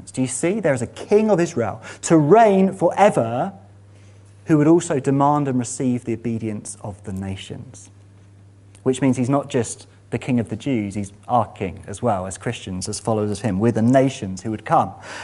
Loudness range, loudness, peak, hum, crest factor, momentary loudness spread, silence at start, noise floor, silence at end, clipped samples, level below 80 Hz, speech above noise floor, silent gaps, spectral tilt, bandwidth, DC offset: 8 LU; -20 LUFS; 0 dBFS; none; 20 dB; 14 LU; 0.05 s; -47 dBFS; 0 s; under 0.1%; -56 dBFS; 27 dB; none; -6.5 dB/octave; 11.5 kHz; under 0.1%